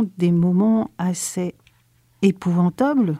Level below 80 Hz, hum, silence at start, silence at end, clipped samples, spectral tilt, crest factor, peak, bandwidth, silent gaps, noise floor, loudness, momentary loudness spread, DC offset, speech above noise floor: -58 dBFS; none; 0 s; 0 s; under 0.1%; -7 dB/octave; 16 dB; -4 dBFS; 14 kHz; none; -59 dBFS; -20 LUFS; 8 LU; under 0.1%; 40 dB